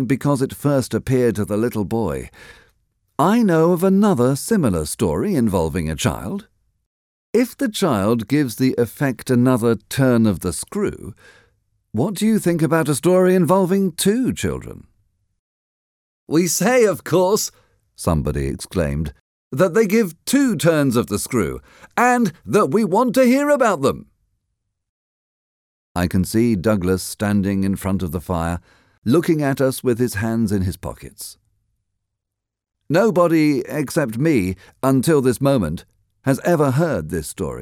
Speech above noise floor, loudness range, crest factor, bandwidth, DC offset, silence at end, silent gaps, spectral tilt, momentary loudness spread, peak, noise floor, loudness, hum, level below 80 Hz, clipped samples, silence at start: 64 dB; 4 LU; 16 dB; 18.5 kHz; under 0.1%; 0 s; 6.86-7.33 s, 15.39-16.27 s, 19.21-19.51 s, 24.89-25.95 s, 28.98-29.02 s; -6 dB/octave; 11 LU; -2 dBFS; -82 dBFS; -19 LUFS; none; -42 dBFS; under 0.1%; 0 s